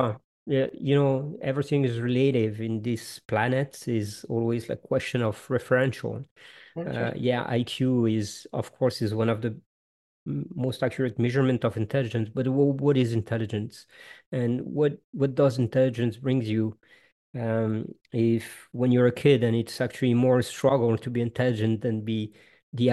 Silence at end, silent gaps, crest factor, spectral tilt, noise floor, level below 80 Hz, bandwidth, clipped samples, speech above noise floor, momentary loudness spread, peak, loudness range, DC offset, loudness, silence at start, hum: 0 s; 0.24-0.46 s, 6.31-6.36 s, 9.66-10.26 s, 14.26-14.32 s, 15.04-15.13 s, 17.12-17.33 s, 22.63-22.72 s; 18 dB; -7 dB/octave; under -90 dBFS; -64 dBFS; 12.5 kHz; under 0.1%; over 64 dB; 11 LU; -8 dBFS; 4 LU; under 0.1%; -26 LUFS; 0 s; none